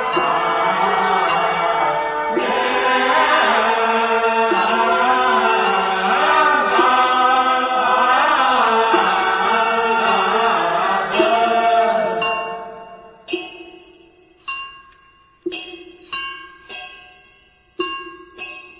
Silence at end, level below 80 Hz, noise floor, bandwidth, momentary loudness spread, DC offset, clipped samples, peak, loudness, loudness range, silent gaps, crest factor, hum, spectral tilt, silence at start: 0.15 s; -56 dBFS; -53 dBFS; 4 kHz; 18 LU; under 0.1%; under 0.1%; -2 dBFS; -16 LUFS; 16 LU; none; 16 dB; none; -7 dB/octave; 0 s